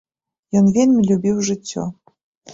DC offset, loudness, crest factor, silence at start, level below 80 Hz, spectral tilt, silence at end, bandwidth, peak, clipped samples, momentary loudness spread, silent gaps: under 0.1%; -17 LUFS; 14 dB; 0.55 s; -54 dBFS; -6.5 dB/octave; 0 s; 7.8 kHz; -4 dBFS; under 0.1%; 13 LU; 2.23-2.41 s